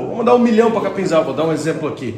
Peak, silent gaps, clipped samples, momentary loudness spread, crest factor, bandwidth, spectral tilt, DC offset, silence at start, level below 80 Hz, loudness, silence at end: 0 dBFS; none; under 0.1%; 8 LU; 16 dB; 10.5 kHz; -6.5 dB/octave; under 0.1%; 0 s; -54 dBFS; -16 LUFS; 0 s